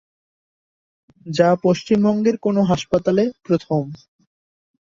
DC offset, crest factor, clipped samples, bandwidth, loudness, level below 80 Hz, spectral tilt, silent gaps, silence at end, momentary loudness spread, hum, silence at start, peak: under 0.1%; 18 dB; under 0.1%; 7.6 kHz; -19 LUFS; -54 dBFS; -7 dB/octave; none; 1 s; 8 LU; none; 1.25 s; -2 dBFS